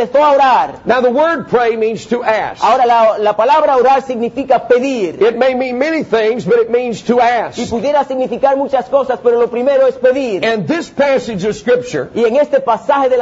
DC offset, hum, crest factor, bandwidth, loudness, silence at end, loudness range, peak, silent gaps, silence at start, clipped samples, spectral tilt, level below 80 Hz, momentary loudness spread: under 0.1%; none; 12 dB; 8 kHz; -13 LUFS; 0 s; 2 LU; 0 dBFS; none; 0 s; under 0.1%; -5.5 dB/octave; -50 dBFS; 7 LU